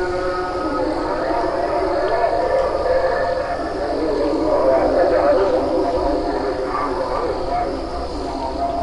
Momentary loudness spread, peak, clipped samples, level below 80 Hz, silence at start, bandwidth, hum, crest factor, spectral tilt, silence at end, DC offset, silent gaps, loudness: 7 LU; -6 dBFS; under 0.1%; -34 dBFS; 0 s; 11 kHz; none; 14 dB; -6 dB/octave; 0 s; under 0.1%; none; -20 LUFS